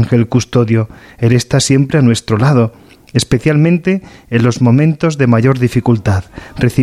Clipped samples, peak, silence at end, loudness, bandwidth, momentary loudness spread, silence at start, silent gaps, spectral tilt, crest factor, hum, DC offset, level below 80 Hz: under 0.1%; 0 dBFS; 0 s; -12 LUFS; 13 kHz; 7 LU; 0 s; none; -6.5 dB/octave; 12 dB; none; under 0.1%; -38 dBFS